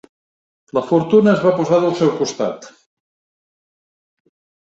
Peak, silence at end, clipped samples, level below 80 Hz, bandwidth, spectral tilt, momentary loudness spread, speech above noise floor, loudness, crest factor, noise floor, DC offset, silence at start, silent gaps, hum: -2 dBFS; 2 s; under 0.1%; -62 dBFS; 8 kHz; -6.5 dB/octave; 11 LU; over 75 dB; -16 LUFS; 18 dB; under -90 dBFS; under 0.1%; 0.75 s; none; none